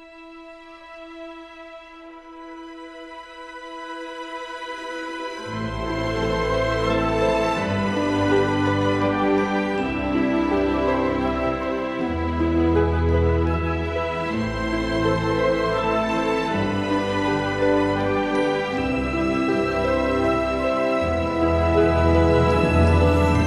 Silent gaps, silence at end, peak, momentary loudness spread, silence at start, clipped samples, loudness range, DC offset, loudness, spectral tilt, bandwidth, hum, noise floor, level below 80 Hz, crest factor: none; 0 s; -4 dBFS; 20 LU; 0 s; under 0.1%; 14 LU; under 0.1%; -22 LUFS; -7 dB/octave; 12 kHz; none; -42 dBFS; -34 dBFS; 16 dB